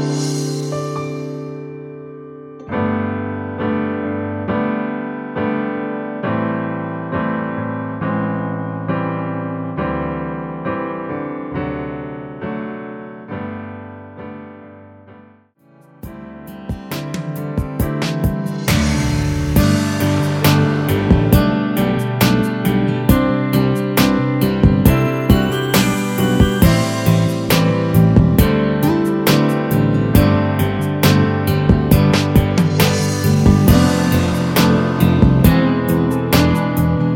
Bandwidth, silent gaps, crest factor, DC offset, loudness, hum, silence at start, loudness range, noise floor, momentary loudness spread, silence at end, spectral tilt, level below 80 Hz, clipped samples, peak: over 20 kHz; none; 16 dB; under 0.1%; -16 LUFS; none; 0 s; 14 LU; -50 dBFS; 15 LU; 0 s; -6.5 dB/octave; -28 dBFS; under 0.1%; 0 dBFS